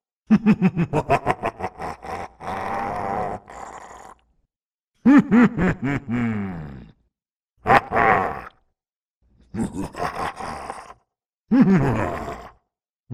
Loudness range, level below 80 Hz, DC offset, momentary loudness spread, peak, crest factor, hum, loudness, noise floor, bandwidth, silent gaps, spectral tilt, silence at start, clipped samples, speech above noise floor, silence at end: 9 LU; -44 dBFS; under 0.1%; 20 LU; 0 dBFS; 22 dB; none; -21 LUFS; -86 dBFS; 12 kHz; 4.65-4.78 s, 4.84-4.88 s, 7.36-7.40 s, 8.96-9.21 s, 12.90-13.00 s; -7.5 dB/octave; 0.3 s; under 0.1%; 66 dB; 0 s